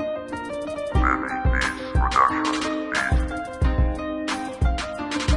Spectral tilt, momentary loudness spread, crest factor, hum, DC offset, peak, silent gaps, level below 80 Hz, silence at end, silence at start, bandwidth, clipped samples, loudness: -5.5 dB/octave; 9 LU; 18 dB; none; under 0.1%; -4 dBFS; none; -28 dBFS; 0 s; 0 s; 11.5 kHz; under 0.1%; -24 LUFS